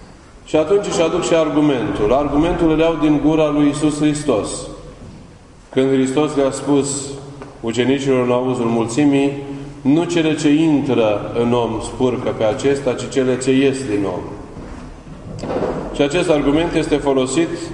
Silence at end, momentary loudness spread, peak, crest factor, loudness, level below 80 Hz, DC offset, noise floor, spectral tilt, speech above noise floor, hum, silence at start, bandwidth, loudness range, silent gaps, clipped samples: 0 s; 14 LU; 0 dBFS; 16 dB; -17 LUFS; -38 dBFS; under 0.1%; -41 dBFS; -5.5 dB/octave; 25 dB; none; 0 s; 11 kHz; 4 LU; none; under 0.1%